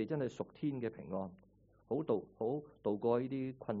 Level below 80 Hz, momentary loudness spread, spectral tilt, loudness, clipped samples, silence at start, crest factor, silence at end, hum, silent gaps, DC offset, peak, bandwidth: -72 dBFS; 8 LU; -8 dB/octave; -39 LUFS; under 0.1%; 0 s; 18 dB; 0 s; none; none; under 0.1%; -20 dBFS; 5 kHz